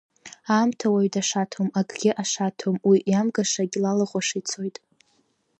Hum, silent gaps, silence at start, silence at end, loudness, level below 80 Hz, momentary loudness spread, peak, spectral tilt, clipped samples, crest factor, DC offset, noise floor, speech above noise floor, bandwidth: none; none; 0.25 s; 0.9 s; -24 LUFS; -72 dBFS; 7 LU; -8 dBFS; -4.5 dB/octave; under 0.1%; 16 dB; under 0.1%; -67 dBFS; 44 dB; 8.6 kHz